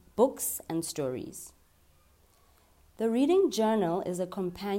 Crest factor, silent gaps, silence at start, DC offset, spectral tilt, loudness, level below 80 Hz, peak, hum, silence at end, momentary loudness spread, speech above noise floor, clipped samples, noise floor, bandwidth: 20 dB; none; 0.15 s; under 0.1%; -5 dB/octave; -29 LUFS; -64 dBFS; -10 dBFS; none; 0 s; 14 LU; 34 dB; under 0.1%; -63 dBFS; 16 kHz